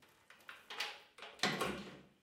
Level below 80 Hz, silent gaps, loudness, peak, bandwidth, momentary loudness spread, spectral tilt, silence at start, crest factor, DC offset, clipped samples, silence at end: -72 dBFS; none; -41 LUFS; -16 dBFS; 16.5 kHz; 19 LU; -3 dB/octave; 0 s; 28 dB; under 0.1%; under 0.1%; 0.15 s